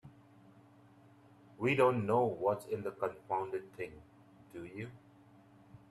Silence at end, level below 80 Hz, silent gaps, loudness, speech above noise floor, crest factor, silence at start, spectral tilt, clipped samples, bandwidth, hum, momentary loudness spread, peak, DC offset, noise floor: 0.15 s; -74 dBFS; none; -35 LUFS; 27 dB; 22 dB; 0.05 s; -7 dB/octave; under 0.1%; 13.5 kHz; none; 18 LU; -16 dBFS; under 0.1%; -62 dBFS